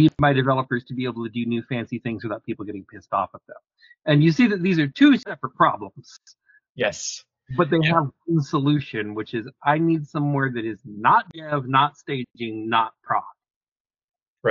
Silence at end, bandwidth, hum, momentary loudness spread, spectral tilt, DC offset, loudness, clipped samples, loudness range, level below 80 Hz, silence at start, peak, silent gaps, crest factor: 0 s; 7.4 kHz; none; 13 LU; -5 dB/octave; under 0.1%; -22 LUFS; under 0.1%; 5 LU; -58 dBFS; 0 s; -4 dBFS; 6.69-6.75 s, 13.56-13.61 s, 13.71-13.85 s, 14.04-14.08 s, 14.28-14.37 s; 20 dB